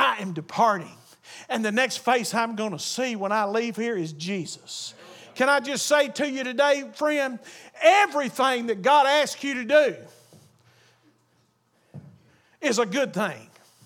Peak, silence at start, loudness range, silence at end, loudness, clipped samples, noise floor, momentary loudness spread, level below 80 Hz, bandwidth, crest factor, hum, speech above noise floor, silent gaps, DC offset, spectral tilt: -4 dBFS; 0 s; 8 LU; 0.4 s; -24 LUFS; under 0.1%; -66 dBFS; 15 LU; -82 dBFS; 18.5 kHz; 20 dB; none; 42 dB; none; under 0.1%; -3 dB/octave